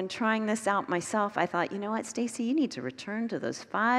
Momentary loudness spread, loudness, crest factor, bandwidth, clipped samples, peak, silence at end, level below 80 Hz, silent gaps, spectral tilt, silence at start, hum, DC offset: 6 LU; -30 LUFS; 20 dB; 13 kHz; under 0.1%; -10 dBFS; 0 s; -76 dBFS; none; -4.5 dB/octave; 0 s; none; under 0.1%